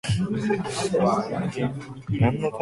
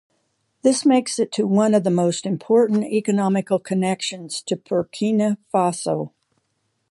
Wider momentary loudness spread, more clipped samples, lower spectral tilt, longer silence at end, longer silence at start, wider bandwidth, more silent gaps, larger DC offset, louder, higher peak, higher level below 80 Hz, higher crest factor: about the same, 7 LU vs 9 LU; neither; about the same, -6.5 dB/octave vs -5.5 dB/octave; second, 0 s vs 0.85 s; second, 0.05 s vs 0.65 s; about the same, 11.5 kHz vs 11.5 kHz; neither; neither; second, -25 LUFS vs -20 LUFS; second, -8 dBFS vs -4 dBFS; first, -48 dBFS vs -68 dBFS; about the same, 16 dB vs 16 dB